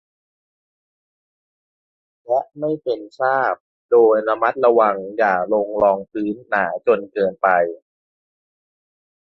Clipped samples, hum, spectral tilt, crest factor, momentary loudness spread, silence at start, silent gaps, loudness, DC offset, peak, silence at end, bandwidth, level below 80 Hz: under 0.1%; none; -8 dB/octave; 18 dB; 10 LU; 2.3 s; 3.60-3.89 s; -19 LUFS; under 0.1%; -2 dBFS; 1.6 s; 5.8 kHz; -62 dBFS